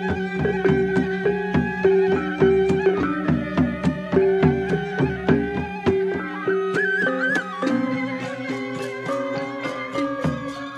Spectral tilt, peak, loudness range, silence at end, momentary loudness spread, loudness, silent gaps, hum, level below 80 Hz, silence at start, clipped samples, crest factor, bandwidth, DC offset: -7.5 dB/octave; -4 dBFS; 4 LU; 0 s; 9 LU; -22 LUFS; none; none; -44 dBFS; 0 s; under 0.1%; 18 dB; 9.6 kHz; under 0.1%